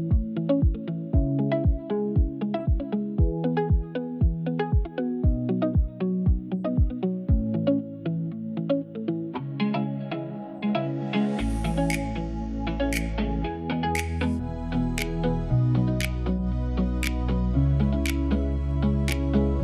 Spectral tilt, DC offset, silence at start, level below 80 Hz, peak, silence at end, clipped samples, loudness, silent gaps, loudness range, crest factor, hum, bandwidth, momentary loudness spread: -7.5 dB/octave; under 0.1%; 0 s; -30 dBFS; -8 dBFS; 0 s; under 0.1%; -27 LUFS; none; 3 LU; 18 dB; none; 15 kHz; 6 LU